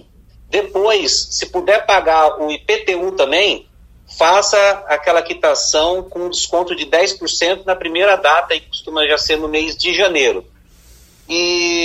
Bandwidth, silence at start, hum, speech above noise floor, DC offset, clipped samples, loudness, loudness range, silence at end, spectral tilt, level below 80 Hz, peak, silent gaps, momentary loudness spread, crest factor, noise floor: 15 kHz; 0.5 s; none; 30 dB; under 0.1%; under 0.1%; -15 LUFS; 1 LU; 0 s; -1 dB/octave; -44 dBFS; 0 dBFS; none; 8 LU; 16 dB; -45 dBFS